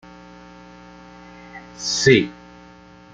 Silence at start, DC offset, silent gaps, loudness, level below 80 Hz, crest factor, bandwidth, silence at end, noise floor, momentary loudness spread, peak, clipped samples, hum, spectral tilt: 1.55 s; under 0.1%; none; -18 LUFS; -54 dBFS; 22 dB; 9.4 kHz; 0.8 s; -46 dBFS; 28 LU; -2 dBFS; under 0.1%; 60 Hz at -45 dBFS; -4 dB/octave